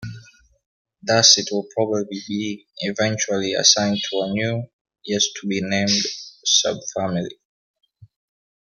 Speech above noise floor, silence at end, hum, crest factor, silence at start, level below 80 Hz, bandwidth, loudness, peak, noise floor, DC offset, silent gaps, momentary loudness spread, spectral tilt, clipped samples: 26 dB; 0.6 s; none; 22 dB; 0 s; -62 dBFS; 11 kHz; -19 LUFS; 0 dBFS; -47 dBFS; under 0.1%; 0.66-0.85 s, 4.73-4.85 s, 7.45-7.74 s; 14 LU; -2.5 dB/octave; under 0.1%